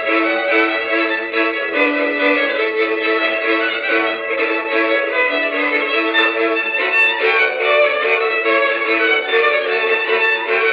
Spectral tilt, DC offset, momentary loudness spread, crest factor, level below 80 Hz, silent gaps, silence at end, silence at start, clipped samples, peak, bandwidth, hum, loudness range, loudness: -3.5 dB/octave; under 0.1%; 3 LU; 14 dB; -66 dBFS; none; 0 s; 0 s; under 0.1%; -2 dBFS; 6.8 kHz; none; 2 LU; -15 LUFS